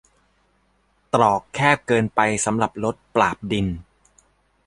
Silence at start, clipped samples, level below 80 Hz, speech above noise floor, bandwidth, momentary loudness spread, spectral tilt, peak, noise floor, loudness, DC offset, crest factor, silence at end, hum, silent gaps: 1.15 s; under 0.1%; -48 dBFS; 44 dB; 11.5 kHz; 6 LU; -4.5 dB/octave; -2 dBFS; -64 dBFS; -21 LUFS; under 0.1%; 22 dB; 0.85 s; 50 Hz at -50 dBFS; none